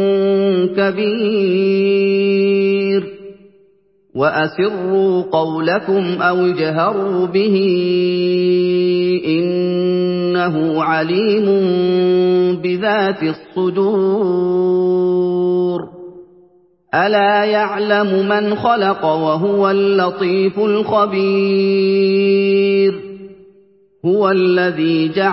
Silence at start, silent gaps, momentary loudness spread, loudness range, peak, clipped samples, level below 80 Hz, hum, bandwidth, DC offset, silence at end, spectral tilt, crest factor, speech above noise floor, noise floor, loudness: 0 s; none; 4 LU; 2 LU; 0 dBFS; under 0.1%; -60 dBFS; none; 5.8 kHz; under 0.1%; 0 s; -11.5 dB/octave; 14 dB; 40 dB; -55 dBFS; -15 LUFS